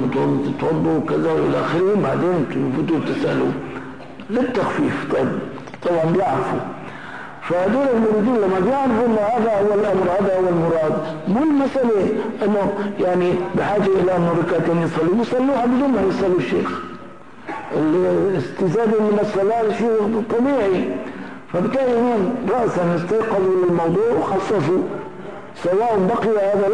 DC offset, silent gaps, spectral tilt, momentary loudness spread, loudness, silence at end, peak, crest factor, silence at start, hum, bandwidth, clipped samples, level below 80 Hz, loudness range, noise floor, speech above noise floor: 0.8%; none; -8 dB/octave; 10 LU; -19 LUFS; 0 s; -10 dBFS; 8 dB; 0 s; none; 10.5 kHz; under 0.1%; -52 dBFS; 3 LU; -39 dBFS; 21 dB